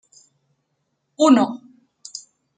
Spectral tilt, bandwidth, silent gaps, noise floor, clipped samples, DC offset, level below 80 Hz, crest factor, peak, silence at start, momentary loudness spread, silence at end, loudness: -4.5 dB/octave; 9.4 kHz; none; -73 dBFS; under 0.1%; under 0.1%; -76 dBFS; 20 dB; -4 dBFS; 1.2 s; 22 LU; 0.4 s; -17 LUFS